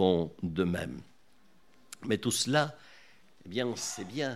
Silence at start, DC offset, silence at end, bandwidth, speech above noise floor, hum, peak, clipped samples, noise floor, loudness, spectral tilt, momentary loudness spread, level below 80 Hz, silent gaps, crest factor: 0 s; 0.1%; 0 s; 15.5 kHz; 35 dB; none; -10 dBFS; under 0.1%; -66 dBFS; -32 LUFS; -4.5 dB/octave; 16 LU; -62 dBFS; none; 22 dB